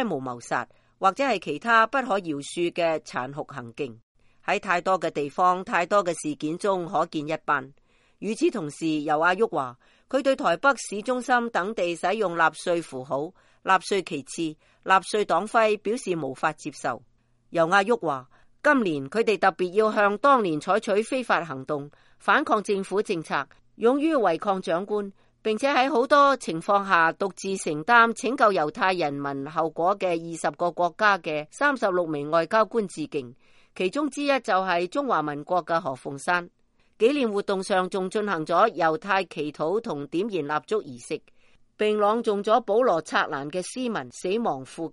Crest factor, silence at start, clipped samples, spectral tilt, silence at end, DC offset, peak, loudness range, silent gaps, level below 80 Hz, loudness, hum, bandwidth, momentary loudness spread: 20 dB; 0 s; under 0.1%; -4.5 dB/octave; 0.05 s; under 0.1%; -4 dBFS; 4 LU; 4.03-4.15 s; -66 dBFS; -25 LUFS; none; 11.5 kHz; 11 LU